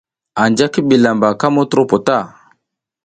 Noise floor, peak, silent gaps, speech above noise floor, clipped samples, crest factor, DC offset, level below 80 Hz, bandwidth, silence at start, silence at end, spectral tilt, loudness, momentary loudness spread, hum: -73 dBFS; 0 dBFS; none; 60 dB; under 0.1%; 14 dB; under 0.1%; -54 dBFS; 9.2 kHz; 0.35 s; 0.75 s; -5.5 dB/octave; -14 LUFS; 7 LU; none